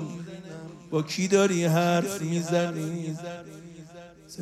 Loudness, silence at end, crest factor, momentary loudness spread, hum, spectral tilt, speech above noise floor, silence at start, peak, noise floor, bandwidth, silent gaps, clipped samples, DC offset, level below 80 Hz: -26 LUFS; 0 s; 18 dB; 22 LU; none; -5.5 dB/octave; 21 dB; 0 s; -10 dBFS; -47 dBFS; 15 kHz; none; under 0.1%; under 0.1%; -66 dBFS